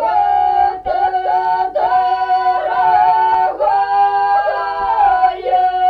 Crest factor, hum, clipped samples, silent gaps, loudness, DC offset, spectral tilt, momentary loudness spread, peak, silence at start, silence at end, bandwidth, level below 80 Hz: 12 dB; none; under 0.1%; none; -14 LUFS; under 0.1%; -5 dB/octave; 4 LU; -2 dBFS; 0 s; 0 s; 5 kHz; -46 dBFS